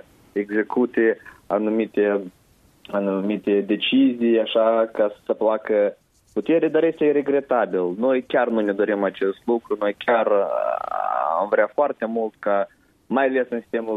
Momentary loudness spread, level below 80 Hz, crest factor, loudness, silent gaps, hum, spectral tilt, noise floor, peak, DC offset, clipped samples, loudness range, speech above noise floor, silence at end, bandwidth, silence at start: 7 LU; -68 dBFS; 16 dB; -22 LUFS; none; none; -7.5 dB/octave; -52 dBFS; -6 dBFS; under 0.1%; under 0.1%; 2 LU; 31 dB; 0 s; 4.8 kHz; 0.35 s